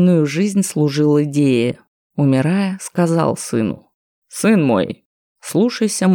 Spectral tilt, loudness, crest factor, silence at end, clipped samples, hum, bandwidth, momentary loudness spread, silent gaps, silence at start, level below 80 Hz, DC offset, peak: -6 dB/octave; -17 LUFS; 14 dB; 0 s; under 0.1%; none; 19 kHz; 13 LU; 1.88-2.10 s, 3.94-4.22 s, 5.05-5.35 s; 0 s; -62 dBFS; under 0.1%; -2 dBFS